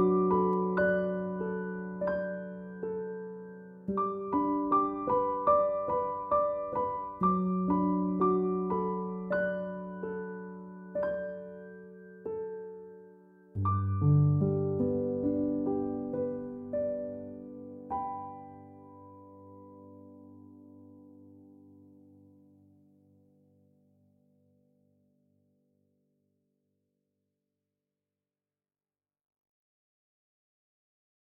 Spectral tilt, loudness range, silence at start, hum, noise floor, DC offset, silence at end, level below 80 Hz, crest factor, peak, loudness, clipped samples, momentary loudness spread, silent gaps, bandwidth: -12 dB/octave; 14 LU; 0 s; 50 Hz at -65 dBFS; under -90 dBFS; under 0.1%; 9.9 s; -64 dBFS; 20 dB; -14 dBFS; -31 LUFS; under 0.1%; 23 LU; none; 4.8 kHz